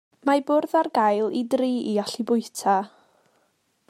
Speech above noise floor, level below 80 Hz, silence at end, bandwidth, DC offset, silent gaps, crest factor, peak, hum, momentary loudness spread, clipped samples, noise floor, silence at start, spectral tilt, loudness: 46 dB; -80 dBFS; 1.05 s; 16 kHz; under 0.1%; none; 16 dB; -8 dBFS; none; 4 LU; under 0.1%; -69 dBFS; 0.25 s; -5 dB/octave; -23 LUFS